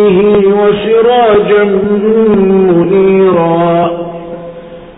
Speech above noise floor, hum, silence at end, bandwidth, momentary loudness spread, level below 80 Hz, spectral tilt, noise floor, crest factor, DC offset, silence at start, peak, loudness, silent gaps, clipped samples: 21 dB; none; 0.05 s; 4 kHz; 16 LU; -40 dBFS; -13 dB/octave; -28 dBFS; 8 dB; under 0.1%; 0 s; 0 dBFS; -8 LUFS; none; under 0.1%